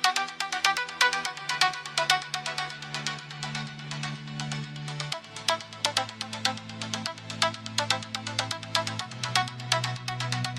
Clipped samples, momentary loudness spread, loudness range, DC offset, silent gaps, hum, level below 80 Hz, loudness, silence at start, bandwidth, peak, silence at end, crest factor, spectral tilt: under 0.1%; 10 LU; 5 LU; under 0.1%; none; none; -66 dBFS; -29 LUFS; 0 s; 16 kHz; -4 dBFS; 0 s; 26 dB; -2 dB/octave